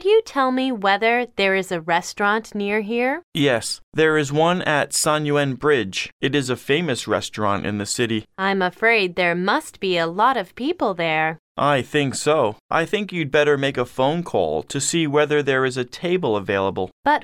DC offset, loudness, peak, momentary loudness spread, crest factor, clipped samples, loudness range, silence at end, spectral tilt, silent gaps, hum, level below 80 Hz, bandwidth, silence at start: under 0.1%; -20 LUFS; -4 dBFS; 5 LU; 16 dB; under 0.1%; 1 LU; 0 s; -4 dB/octave; 3.23-3.32 s, 3.83-3.92 s, 6.12-6.20 s, 11.39-11.55 s, 12.60-12.69 s, 16.92-17.03 s; none; -56 dBFS; 16 kHz; 0 s